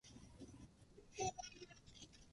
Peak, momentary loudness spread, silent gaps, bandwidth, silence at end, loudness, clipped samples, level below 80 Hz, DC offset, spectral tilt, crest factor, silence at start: -32 dBFS; 17 LU; none; 11.5 kHz; 0 s; -52 LUFS; under 0.1%; -68 dBFS; under 0.1%; -3 dB/octave; 22 dB; 0.05 s